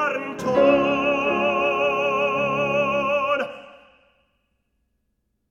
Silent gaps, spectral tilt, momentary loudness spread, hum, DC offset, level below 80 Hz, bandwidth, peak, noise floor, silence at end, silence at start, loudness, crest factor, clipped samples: none; -5.5 dB/octave; 8 LU; none; under 0.1%; -56 dBFS; 7.8 kHz; -6 dBFS; -73 dBFS; 1.75 s; 0 s; -21 LUFS; 18 dB; under 0.1%